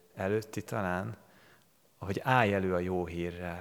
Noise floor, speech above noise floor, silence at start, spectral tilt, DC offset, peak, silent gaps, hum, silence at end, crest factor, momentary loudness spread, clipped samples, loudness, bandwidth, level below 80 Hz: -65 dBFS; 33 dB; 0.15 s; -6.5 dB/octave; under 0.1%; -8 dBFS; none; none; 0 s; 24 dB; 13 LU; under 0.1%; -32 LUFS; 20 kHz; -66 dBFS